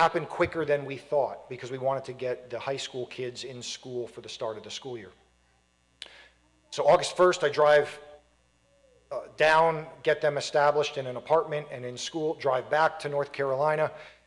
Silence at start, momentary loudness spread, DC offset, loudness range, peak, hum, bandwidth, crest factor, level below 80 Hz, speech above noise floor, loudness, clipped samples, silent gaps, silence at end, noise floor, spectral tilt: 0 s; 16 LU; under 0.1%; 11 LU; -12 dBFS; none; 11.5 kHz; 18 dB; -66 dBFS; 40 dB; -28 LUFS; under 0.1%; none; 0.2 s; -67 dBFS; -4 dB/octave